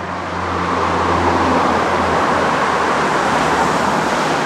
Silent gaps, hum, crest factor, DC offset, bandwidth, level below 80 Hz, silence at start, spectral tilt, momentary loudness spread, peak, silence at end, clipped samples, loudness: none; none; 14 dB; under 0.1%; 16 kHz; -44 dBFS; 0 s; -4.5 dB/octave; 4 LU; -2 dBFS; 0 s; under 0.1%; -16 LUFS